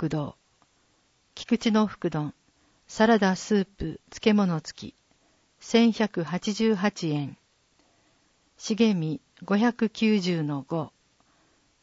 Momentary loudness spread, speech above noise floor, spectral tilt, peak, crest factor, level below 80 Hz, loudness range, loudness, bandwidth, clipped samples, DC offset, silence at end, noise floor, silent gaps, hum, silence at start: 16 LU; 42 dB; -6 dB/octave; -8 dBFS; 20 dB; -58 dBFS; 3 LU; -26 LUFS; 8 kHz; under 0.1%; under 0.1%; 0.95 s; -67 dBFS; none; none; 0 s